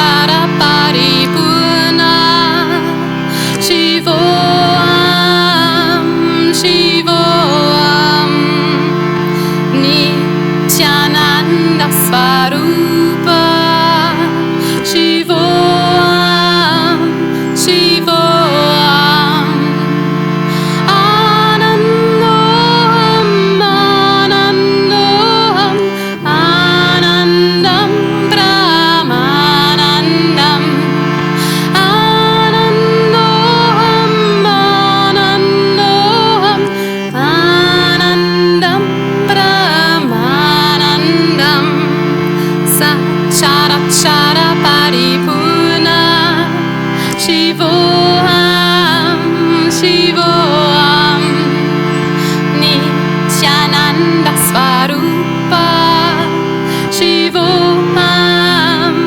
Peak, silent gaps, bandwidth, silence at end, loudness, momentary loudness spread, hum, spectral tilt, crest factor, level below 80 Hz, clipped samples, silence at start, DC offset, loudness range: 0 dBFS; none; 19 kHz; 0 s; -9 LUFS; 5 LU; none; -4.5 dB/octave; 10 dB; -44 dBFS; under 0.1%; 0 s; under 0.1%; 1 LU